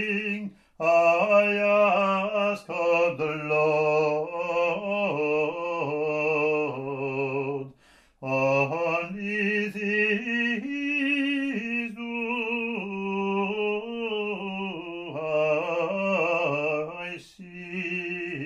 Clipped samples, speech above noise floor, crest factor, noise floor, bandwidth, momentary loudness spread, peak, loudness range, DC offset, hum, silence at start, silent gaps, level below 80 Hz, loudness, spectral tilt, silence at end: under 0.1%; 37 dB; 18 dB; -59 dBFS; 10.5 kHz; 11 LU; -8 dBFS; 5 LU; under 0.1%; none; 0 s; none; -68 dBFS; -26 LUFS; -6 dB/octave; 0 s